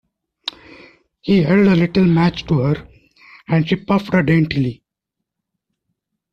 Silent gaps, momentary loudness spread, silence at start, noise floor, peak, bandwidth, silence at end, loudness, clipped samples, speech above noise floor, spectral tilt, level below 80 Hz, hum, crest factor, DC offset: none; 16 LU; 1.25 s; -81 dBFS; -4 dBFS; 6.6 kHz; 1.6 s; -16 LUFS; under 0.1%; 66 dB; -8.5 dB/octave; -46 dBFS; none; 16 dB; under 0.1%